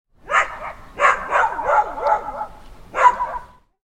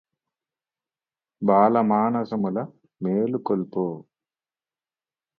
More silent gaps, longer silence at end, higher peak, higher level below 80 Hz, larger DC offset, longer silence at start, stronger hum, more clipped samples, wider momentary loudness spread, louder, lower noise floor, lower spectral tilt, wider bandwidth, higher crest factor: neither; second, 0.45 s vs 1.35 s; about the same, -2 dBFS vs -4 dBFS; first, -44 dBFS vs -70 dBFS; neither; second, 0.25 s vs 1.4 s; neither; neither; first, 17 LU vs 13 LU; first, -19 LUFS vs -23 LUFS; second, -39 dBFS vs under -90 dBFS; second, -2.5 dB/octave vs -11 dB/octave; first, 10.5 kHz vs 5 kHz; about the same, 20 dB vs 22 dB